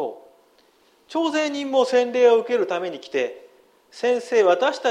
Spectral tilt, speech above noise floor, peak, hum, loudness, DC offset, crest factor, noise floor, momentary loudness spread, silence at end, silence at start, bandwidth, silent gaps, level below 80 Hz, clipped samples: -3 dB/octave; 38 dB; -6 dBFS; none; -21 LUFS; under 0.1%; 16 dB; -59 dBFS; 10 LU; 0 s; 0 s; 10.5 kHz; none; -76 dBFS; under 0.1%